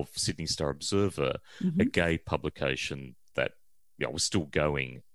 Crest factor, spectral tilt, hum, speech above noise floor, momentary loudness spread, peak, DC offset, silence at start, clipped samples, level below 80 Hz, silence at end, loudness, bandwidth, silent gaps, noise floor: 22 dB; -4.5 dB/octave; none; 36 dB; 8 LU; -8 dBFS; 0.2%; 0 s; under 0.1%; -50 dBFS; 0.15 s; -30 LUFS; 13 kHz; none; -66 dBFS